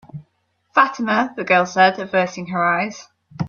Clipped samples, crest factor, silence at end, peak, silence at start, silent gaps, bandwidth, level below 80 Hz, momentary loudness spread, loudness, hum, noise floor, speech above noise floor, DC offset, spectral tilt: under 0.1%; 18 dB; 0 s; -2 dBFS; 0.15 s; none; 7.2 kHz; -62 dBFS; 7 LU; -18 LUFS; none; -67 dBFS; 49 dB; under 0.1%; -5 dB/octave